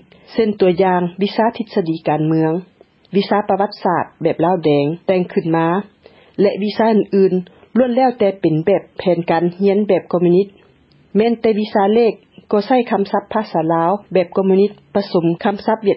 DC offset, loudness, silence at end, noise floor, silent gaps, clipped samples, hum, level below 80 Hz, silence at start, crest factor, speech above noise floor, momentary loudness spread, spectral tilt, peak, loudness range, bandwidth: under 0.1%; -16 LUFS; 0 s; -51 dBFS; none; under 0.1%; none; -58 dBFS; 0.3 s; 14 dB; 36 dB; 6 LU; -11 dB/octave; -2 dBFS; 2 LU; 5.8 kHz